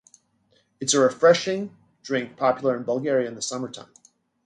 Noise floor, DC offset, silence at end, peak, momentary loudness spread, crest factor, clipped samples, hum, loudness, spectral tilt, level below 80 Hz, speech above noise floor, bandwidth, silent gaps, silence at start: -65 dBFS; under 0.1%; 0.6 s; -4 dBFS; 17 LU; 20 dB; under 0.1%; none; -23 LUFS; -3.5 dB/octave; -72 dBFS; 43 dB; 11 kHz; none; 0.8 s